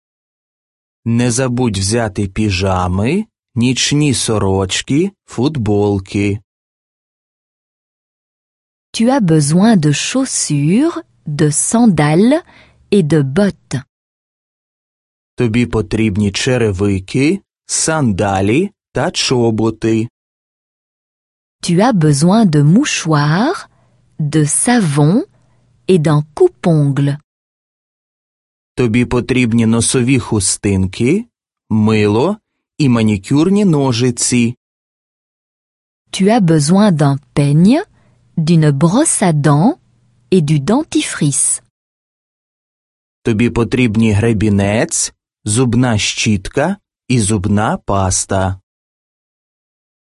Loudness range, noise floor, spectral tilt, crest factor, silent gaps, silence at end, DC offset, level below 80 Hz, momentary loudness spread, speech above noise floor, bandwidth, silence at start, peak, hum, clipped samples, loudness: 5 LU; -54 dBFS; -5 dB/octave; 14 dB; 6.44-8.93 s, 13.89-15.37 s, 20.10-21.59 s, 27.24-28.75 s, 34.57-36.05 s, 41.70-43.22 s; 1.55 s; under 0.1%; -38 dBFS; 8 LU; 41 dB; 11.5 kHz; 1.05 s; 0 dBFS; none; under 0.1%; -13 LUFS